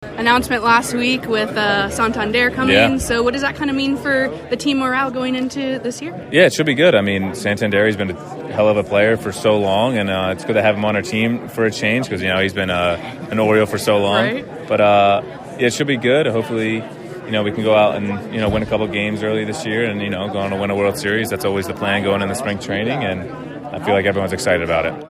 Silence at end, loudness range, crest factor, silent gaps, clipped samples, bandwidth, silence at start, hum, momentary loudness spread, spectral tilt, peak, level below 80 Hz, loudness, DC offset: 0 s; 4 LU; 18 dB; none; under 0.1%; 15.5 kHz; 0 s; none; 9 LU; -5 dB/octave; 0 dBFS; -44 dBFS; -17 LUFS; under 0.1%